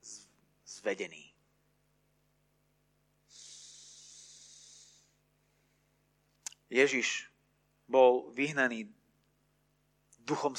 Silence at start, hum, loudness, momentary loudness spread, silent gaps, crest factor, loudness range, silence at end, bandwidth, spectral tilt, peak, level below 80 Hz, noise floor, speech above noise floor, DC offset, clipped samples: 0.05 s; 50 Hz at -75 dBFS; -31 LUFS; 27 LU; none; 24 dB; 23 LU; 0 s; 11.5 kHz; -3 dB/octave; -12 dBFS; -82 dBFS; -74 dBFS; 44 dB; under 0.1%; under 0.1%